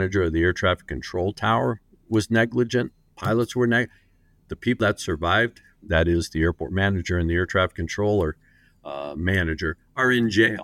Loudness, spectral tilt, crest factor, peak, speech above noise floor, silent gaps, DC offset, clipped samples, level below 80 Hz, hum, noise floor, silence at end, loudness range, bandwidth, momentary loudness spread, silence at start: -23 LUFS; -6 dB/octave; 18 dB; -6 dBFS; 37 dB; none; under 0.1%; under 0.1%; -40 dBFS; none; -59 dBFS; 0 s; 2 LU; 15 kHz; 9 LU; 0 s